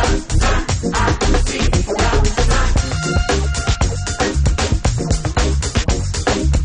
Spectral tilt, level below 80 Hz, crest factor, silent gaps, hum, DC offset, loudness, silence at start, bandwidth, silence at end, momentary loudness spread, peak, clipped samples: -4.5 dB/octave; -18 dBFS; 14 dB; none; none; under 0.1%; -18 LUFS; 0 s; 10.5 kHz; 0 s; 3 LU; -2 dBFS; under 0.1%